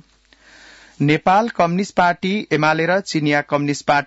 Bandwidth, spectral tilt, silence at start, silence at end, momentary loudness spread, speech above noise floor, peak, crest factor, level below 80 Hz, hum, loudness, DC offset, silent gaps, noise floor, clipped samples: 8 kHz; -5.5 dB/octave; 1 s; 0 s; 4 LU; 35 dB; -4 dBFS; 14 dB; -56 dBFS; none; -18 LUFS; under 0.1%; none; -52 dBFS; under 0.1%